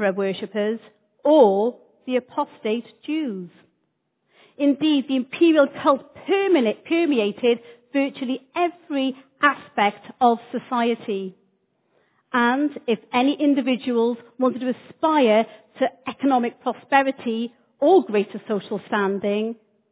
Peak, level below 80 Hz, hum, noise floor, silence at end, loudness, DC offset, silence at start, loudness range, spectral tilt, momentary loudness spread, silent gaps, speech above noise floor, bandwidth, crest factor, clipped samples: -2 dBFS; -74 dBFS; none; -73 dBFS; 0.4 s; -22 LUFS; under 0.1%; 0 s; 3 LU; -9.5 dB/octave; 11 LU; none; 51 dB; 4 kHz; 20 dB; under 0.1%